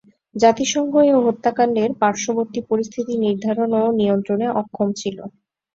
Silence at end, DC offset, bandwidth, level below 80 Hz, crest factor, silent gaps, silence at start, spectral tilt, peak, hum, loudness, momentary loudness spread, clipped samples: 0.45 s; under 0.1%; 7.8 kHz; -60 dBFS; 18 dB; none; 0.35 s; -5 dB/octave; -2 dBFS; none; -19 LUFS; 8 LU; under 0.1%